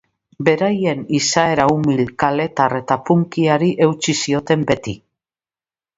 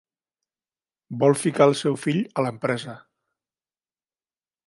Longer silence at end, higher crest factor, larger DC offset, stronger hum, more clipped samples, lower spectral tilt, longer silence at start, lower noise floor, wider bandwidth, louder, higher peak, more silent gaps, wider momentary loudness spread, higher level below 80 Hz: second, 1 s vs 1.7 s; about the same, 18 dB vs 22 dB; neither; neither; neither; about the same, -5 dB/octave vs -5.5 dB/octave; second, 0.4 s vs 1.1 s; about the same, under -90 dBFS vs under -90 dBFS; second, 8 kHz vs 11.5 kHz; first, -17 LUFS vs -22 LUFS; first, 0 dBFS vs -4 dBFS; neither; second, 5 LU vs 11 LU; first, -52 dBFS vs -72 dBFS